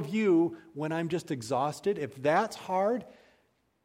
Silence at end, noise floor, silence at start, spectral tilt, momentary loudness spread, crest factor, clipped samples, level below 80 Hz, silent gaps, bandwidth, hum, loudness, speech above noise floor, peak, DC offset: 0.7 s; -71 dBFS; 0 s; -6 dB/octave; 8 LU; 18 dB; under 0.1%; -72 dBFS; none; 15.5 kHz; none; -30 LUFS; 41 dB; -14 dBFS; under 0.1%